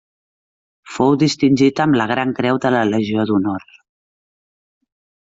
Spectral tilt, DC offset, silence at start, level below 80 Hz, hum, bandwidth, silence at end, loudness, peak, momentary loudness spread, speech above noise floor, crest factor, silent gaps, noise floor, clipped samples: -6 dB/octave; under 0.1%; 0.85 s; -58 dBFS; none; 7.8 kHz; 1.7 s; -16 LUFS; -2 dBFS; 5 LU; over 74 dB; 18 dB; none; under -90 dBFS; under 0.1%